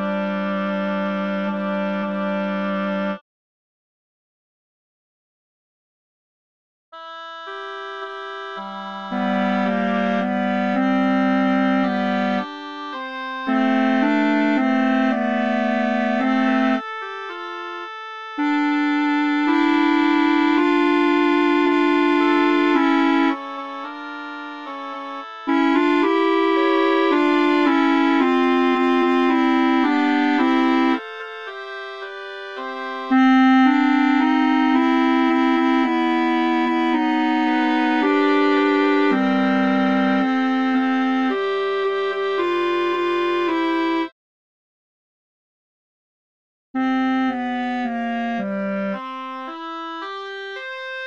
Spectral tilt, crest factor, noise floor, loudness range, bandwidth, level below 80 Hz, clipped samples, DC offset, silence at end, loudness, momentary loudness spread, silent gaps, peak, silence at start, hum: -6.5 dB/octave; 14 dB; under -90 dBFS; 10 LU; 7.4 kHz; -74 dBFS; under 0.1%; 0.3%; 0 s; -19 LUFS; 14 LU; 3.21-6.92 s, 44.12-46.74 s; -6 dBFS; 0 s; none